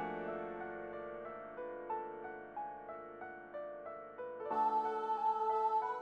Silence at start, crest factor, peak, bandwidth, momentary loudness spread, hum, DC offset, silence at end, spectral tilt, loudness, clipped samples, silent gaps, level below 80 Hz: 0 s; 16 dB; -24 dBFS; 6.6 kHz; 14 LU; none; under 0.1%; 0 s; -6.5 dB/octave; -40 LUFS; under 0.1%; none; -76 dBFS